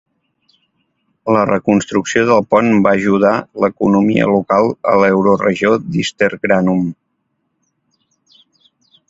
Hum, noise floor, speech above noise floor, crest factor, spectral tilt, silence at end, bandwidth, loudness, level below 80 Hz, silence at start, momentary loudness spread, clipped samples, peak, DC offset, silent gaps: none; -68 dBFS; 55 dB; 16 dB; -6.5 dB/octave; 2.15 s; 7.8 kHz; -14 LUFS; -50 dBFS; 1.25 s; 5 LU; under 0.1%; 0 dBFS; under 0.1%; none